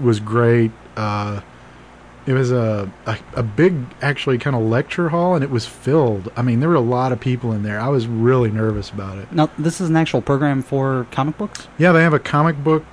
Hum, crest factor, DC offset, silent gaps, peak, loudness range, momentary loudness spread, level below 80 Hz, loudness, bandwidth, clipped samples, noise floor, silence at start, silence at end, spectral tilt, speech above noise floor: none; 14 dB; 0.1%; none; -4 dBFS; 3 LU; 9 LU; -46 dBFS; -18 LUFS; 11 kHz; under 0.1%; -42 dBFS; 0 s; 0.05 s; -7.5 dB/octave; 24 dB